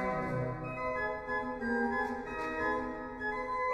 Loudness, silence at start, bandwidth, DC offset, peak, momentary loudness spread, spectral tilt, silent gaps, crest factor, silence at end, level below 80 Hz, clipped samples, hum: -35 LUFS; 0 s; 12 kHz; under 0.1%; -20 dBFS; 5 LU; -7 dB/octave; none; 14 dB; 0 s; -54 dBFS; under 0.1%; none